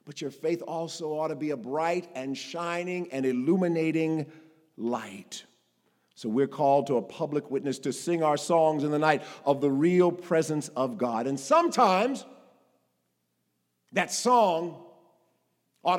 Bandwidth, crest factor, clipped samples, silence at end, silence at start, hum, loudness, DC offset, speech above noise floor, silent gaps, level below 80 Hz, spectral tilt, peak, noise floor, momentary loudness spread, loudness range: 16.5 kHz; 22 dB; under 0.1%; 0 s; 0.05 s; none; -27 LUFS; under 0.1%; 50 dB; none; -88 dBFS; -5.5 dB/octave; -6 dBFS; -77 dBFS; 12 LU; 5 LU